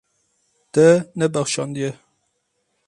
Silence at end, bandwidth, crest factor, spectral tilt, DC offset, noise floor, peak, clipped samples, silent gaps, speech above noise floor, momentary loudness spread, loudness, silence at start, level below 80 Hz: 0.95 s; 11.5 kHz; 18 dB; -5 dB/octave; under 0.1%; -71 dBFS; -2 dBFS; under 0.1%; none; 53 dB; 12 LU; -19 LUFS; 0.75 s; -62 dBFS